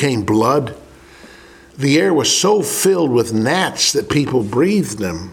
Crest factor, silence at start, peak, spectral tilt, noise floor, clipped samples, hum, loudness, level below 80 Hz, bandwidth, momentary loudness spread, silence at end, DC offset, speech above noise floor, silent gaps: 16 dB; 0 s; 0 dBFS; -4 dB/octave; -42 dBFS; under 0.1%; none; -15 LUFS; -48 dBFS; 18 kHz; 6 LU; 0 s; under 0.1%; 26 dB; none